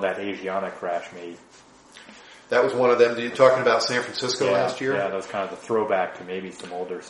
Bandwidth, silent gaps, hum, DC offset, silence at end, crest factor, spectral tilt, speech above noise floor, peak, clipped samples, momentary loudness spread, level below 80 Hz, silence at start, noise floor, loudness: 11.5 kHz; none; none; under 0.1%; 0 s; 22 dB; -4 dB/octave; 24 dB; -2 dBFS; under 0.1%; 15 LU; -70 dBFS; 0 s; -47 dBFS; -23 LUFS